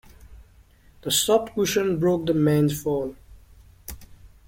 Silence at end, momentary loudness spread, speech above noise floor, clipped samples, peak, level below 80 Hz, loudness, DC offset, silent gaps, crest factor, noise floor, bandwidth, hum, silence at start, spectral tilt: 0.2 s; 21 LU; 32 dB; under 0.1%; -6 dBFS; -50 dBFS; -22 LUFS; under 0.1%; none; 18 dB; -54 dBFS; 16.5 kHz; none; 0.3 s; -4.5 dB/octave